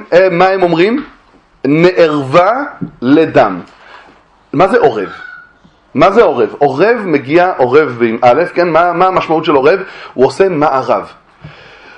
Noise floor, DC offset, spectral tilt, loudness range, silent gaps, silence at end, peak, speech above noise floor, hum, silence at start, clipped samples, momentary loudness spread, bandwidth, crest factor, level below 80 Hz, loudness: -45 dBFS; under 0.1%; -7 dB/octave; 3 LU; none; 0.45 s; 0 dBFS; 35 dB; none; 0 s; 0.3%; 11 LU; 10 kHz; 12 dB; -48 dBFS; -10 LUFS